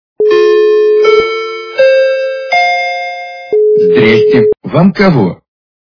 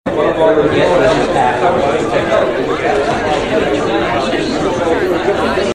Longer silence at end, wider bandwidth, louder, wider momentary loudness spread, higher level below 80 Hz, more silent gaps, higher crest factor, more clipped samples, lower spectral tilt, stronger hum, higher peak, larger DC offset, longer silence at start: first, 0.55 s vs 0 s; second, 5.4 kHz vs 13.5 kHz; first, -9 LUFS vs -13 LUFS; first, 9 LU vs 4 LU; second, -46 dBFS vs -36 dBFS; neither; about the same, 10 dB vs 12 dB; first, 0.3% vs under 0.1%; first, -7 dB/octave vs -5.5 dB/octave; neither; about the same, 0 dBFS vs 0 dBFS; second, under 0.1% vs 0.6%; first, 0.2 s vs 0.05 s